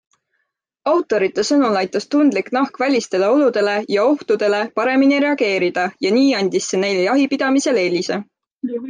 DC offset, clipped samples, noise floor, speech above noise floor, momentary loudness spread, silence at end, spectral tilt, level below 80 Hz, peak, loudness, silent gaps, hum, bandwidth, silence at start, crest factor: under 0.1%; under 0.1%; -73 dBFS; 56 dB; 5 LU; 0 s; -4.5 dB/octave; -70 dBFS; -6 dBFS; -17 LUFS; 8.52-8.57 s; none; 9.8 kHz; 0.85 s; 12 dB